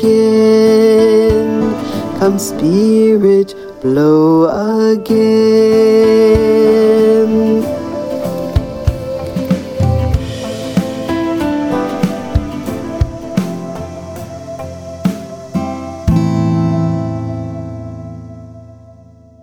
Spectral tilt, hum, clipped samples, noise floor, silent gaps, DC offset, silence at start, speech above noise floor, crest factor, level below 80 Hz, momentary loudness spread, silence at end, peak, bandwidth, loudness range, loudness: -7 dB/octave; none; under 0.1%; -41 dBFS; none; under 0.1%; 0 s; 31 dB; 12 dB; -30 dBFS; 17 LU; 0.7 s; 0 dBFS; 16.5 kHz; 10 LU; -13 LUFS